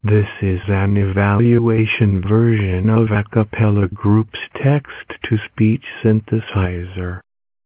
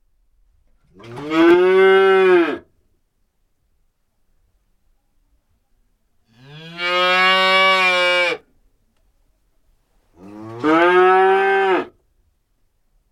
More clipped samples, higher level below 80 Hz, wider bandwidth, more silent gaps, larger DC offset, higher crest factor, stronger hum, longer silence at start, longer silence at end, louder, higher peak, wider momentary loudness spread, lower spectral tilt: neither; first, -34 dBFS vs -60 dBFS; second, 4 kHz vs 12 kHz; neither; neither; about the same, 12 dB vs 16 dB; neither; second, 0.05 s vs 1.05 s; second, 0.45 s vs 1.25 s; second, -17 LUFS vs -14 LUFS; about the same, -4 dBFS vs -2 dBFS; second, 11 LU vs 20 LU; first, -12 dB/octave vs -4.5 dB/octave